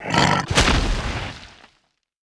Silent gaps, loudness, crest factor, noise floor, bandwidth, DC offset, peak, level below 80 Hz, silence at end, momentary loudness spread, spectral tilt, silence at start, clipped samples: none; -20 LUFS; 22 dB; -66 dBFS; 11 kHz; under 0.1%; 0 dBFS; -28 dBFS; 0.75 s; 15 LU; -4 dB/octave; 0 s; under 0.1%